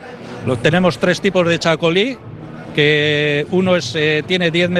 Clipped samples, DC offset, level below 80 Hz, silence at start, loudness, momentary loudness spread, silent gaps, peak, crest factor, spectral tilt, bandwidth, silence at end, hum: under 0.1%; under 0.1%; -48 dBFS; 0 s; -15 LUFS; 11 LU; none; 0 dBFS; 16 dB; -5.5 dB/octave; 12 kHz; 0 s; none